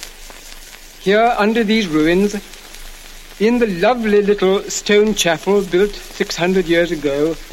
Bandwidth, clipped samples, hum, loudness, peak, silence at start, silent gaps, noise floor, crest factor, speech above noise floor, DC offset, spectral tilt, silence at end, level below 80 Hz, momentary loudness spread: 16.5 kHz; under 0.1%; none; -16 LUFS; -2 dBFS; 0 s; none; -37 dBFS; 14 dB; 21 dB; under 0.1%; -4.5 dB/octave; 0 s; -38 dBFS; 21 LU